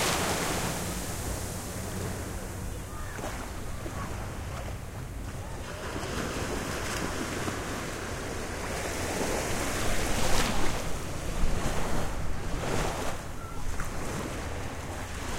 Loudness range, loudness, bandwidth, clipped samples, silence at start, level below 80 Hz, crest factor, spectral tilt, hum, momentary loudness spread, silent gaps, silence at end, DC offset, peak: 6 LU; -33 LUFS; 16 kHz; under 0.1%; 0 s; -38 dBFS; 18 dB; -4 dB/octave; none; 9 LU; none; 0 s; under 0.1%; -12 dBFS